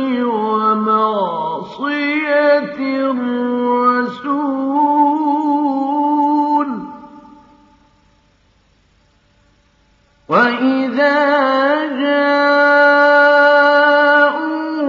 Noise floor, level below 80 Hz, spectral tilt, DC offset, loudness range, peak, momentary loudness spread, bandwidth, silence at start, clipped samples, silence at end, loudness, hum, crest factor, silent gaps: -55 dBFS; -64 dBFS; -6 dB/octave; under 0.1%; 10 LU; 0 dBFS; 10 LU; 7 kHz; 0 s; under 0.1%; 0 s; -14 LUFS; none; 14 dB; none